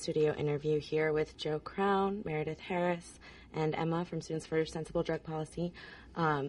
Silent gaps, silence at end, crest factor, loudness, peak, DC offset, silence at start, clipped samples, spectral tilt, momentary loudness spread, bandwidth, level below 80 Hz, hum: none; 0 s; 16 dB; -35 LUFS; -20 dBFS; under 0.1%; 0 s; under 0.1%; -6.5 dB/octave; 9 LU; 11 kHz; -60 dBFS; none